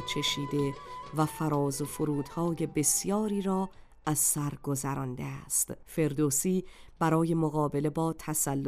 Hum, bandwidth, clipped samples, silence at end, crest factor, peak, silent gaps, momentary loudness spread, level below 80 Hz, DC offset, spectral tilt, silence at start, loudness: none; 16 kHz; under 0.1%; 0 s; 16 dB; -14 dBFS; none; 8 LU; -56 dBFS; under 0.1%; -4.5 dB/octave; 0 s; -30 LUFS